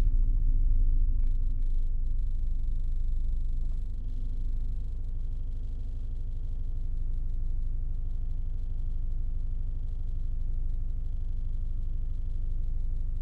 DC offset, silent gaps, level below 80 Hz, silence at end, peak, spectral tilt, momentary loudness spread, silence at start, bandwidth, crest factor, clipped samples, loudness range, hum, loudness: under 0.1%; none; -28 dBFS; 0 s; -14 dBFS; -9.5 dB/octave; 8 LU; 0 s; 0.8 kHz; 12 dB; under 0.1%; 4 LU; none; -36 LUFS